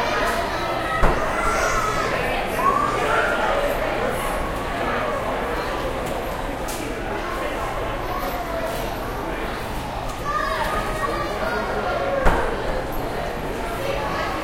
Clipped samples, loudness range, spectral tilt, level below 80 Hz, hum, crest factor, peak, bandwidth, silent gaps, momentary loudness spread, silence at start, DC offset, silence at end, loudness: under 0.1%; 6 LU; -4.5 dB/octave; -32 dBFS; none; 22 dB; -2 dBFS; 16 kHz; none; 7 LU; 0 s; under 0.1%; 0 s; -24 LUFS